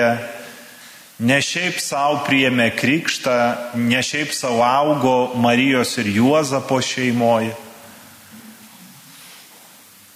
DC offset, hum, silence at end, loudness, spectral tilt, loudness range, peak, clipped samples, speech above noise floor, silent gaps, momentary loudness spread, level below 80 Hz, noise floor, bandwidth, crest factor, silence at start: under 0.1%; none; 0.75 s; -18 LUFS; -4 dB/octave; 6 LU; -2 dBFS; under 0.1%; 28 dB; none; 14 LU; -66 dBFS; -46 dBFS; 16 kHz; 16 dB; 0 s